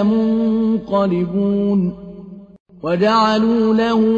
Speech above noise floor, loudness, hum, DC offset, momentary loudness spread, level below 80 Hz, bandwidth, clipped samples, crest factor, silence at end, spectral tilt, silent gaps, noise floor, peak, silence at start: 21 dB; -16 LUFS; none; under 0.1%; 13 LU; -48 dBFS; 7.4 kHz; under 0.1%; 12 dB; 0 s; -7.5 dB/octave; 2.60-2.66 s; -36 dBFS; -4 dBFS; 0 s